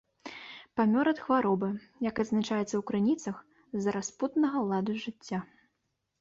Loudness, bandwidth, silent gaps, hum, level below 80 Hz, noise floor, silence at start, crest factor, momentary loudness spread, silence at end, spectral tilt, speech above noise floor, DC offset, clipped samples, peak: -31 LUFS; 7.8 kHz; none; none; -68 dBFS; -81 dBFS; 0.25 s; 16 dB; 13 LU; 0.75 s; -6 dB/octave; 51 dB; under 0.1%; under 0.1%; -14 dBFS